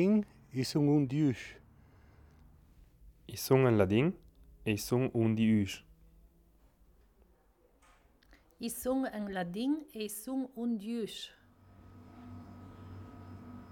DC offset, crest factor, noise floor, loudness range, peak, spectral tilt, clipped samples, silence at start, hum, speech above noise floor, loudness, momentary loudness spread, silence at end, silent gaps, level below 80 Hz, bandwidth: under 0.1%; 22 dB; -68 dBFS; 11 LU; -12 dBFS; -6.5 dB/octave; under 0.1%; 0 s; none; 37 dB; -33 LUFS; 22 LU; 0 s; none; -62 dBFS; 18.5 kHz